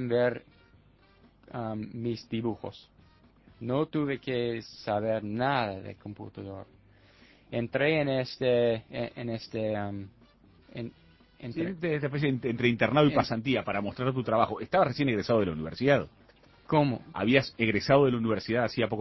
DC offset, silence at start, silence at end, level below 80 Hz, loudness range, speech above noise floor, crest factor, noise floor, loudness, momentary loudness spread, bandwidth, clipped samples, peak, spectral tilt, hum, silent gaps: under 0.1%; 0 s; 0 s; -58 dBFS; 8 LU; 32 dB; 22 dB; -60 dBFS; -29 LUFS; 17 LU; 6.2 kHz; under 0.1%; -6 dBFS; -7.5 dB/octave; none; none